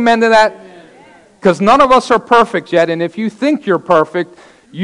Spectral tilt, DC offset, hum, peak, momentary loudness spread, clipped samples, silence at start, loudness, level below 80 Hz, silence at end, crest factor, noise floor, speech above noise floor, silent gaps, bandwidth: -5.5 dB/octave; under 0.1%; none; 0 dBFS; 9 LU; under 0.1%; 0 s; -12 LUFS; -48 dBFS; 0 s; 12 dB; -43 dBFS; 31 dB; none; 11 kHz